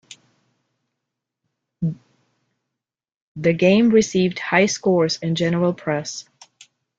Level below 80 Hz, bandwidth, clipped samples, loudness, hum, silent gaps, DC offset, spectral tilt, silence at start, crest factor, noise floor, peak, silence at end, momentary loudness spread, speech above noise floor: -58 dBFS; 7.8 kHz; under 0.1%; -19 LUFS; none; 3.16-3.35 s; under 0.1%; -5.5 dB/octave; 1.8 s; 20 dB; -85 dBFS; -2 dBFS; 0.8 s; 12 LU; 67 dB